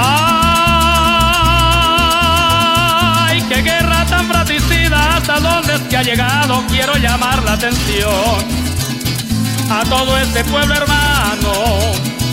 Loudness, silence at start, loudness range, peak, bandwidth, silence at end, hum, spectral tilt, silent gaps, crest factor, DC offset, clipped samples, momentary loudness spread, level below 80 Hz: -12 LUFS; 0 s; 4 LU; 0 dBFS; 16.5 kHz; 0 s; none; -4 dB/octave; none; 12 dB; under 0.1%; under 0.1%; 6 LU; -22 dBFS